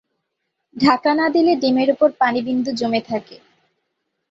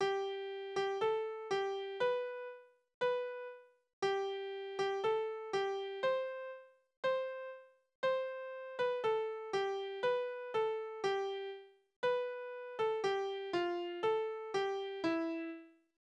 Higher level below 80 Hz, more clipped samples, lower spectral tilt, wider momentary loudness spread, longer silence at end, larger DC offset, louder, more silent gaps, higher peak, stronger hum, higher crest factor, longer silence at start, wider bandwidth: first, -62 dBFS vs -82 dBFS; neither; first, -5.5 dB/octave vs -4 dB/octave; second, 6 LU vs 11 LU; first, 0.95 s vs 0.3 s; neither; first, -18 LUFS vs -38 LUFS; second, none vs 2.94-3.01 s, 3.93-4.02 s, 6.97-7.03 s, 7.95-8.03 s, 11.96-12.03 s; first, -2 dBFS vs -24 dBFS; neither; about the same, 16 dB vs 14 dB; first, 0.75 s vs 0 s; second, 7.8 kHz vs 9.8 kHz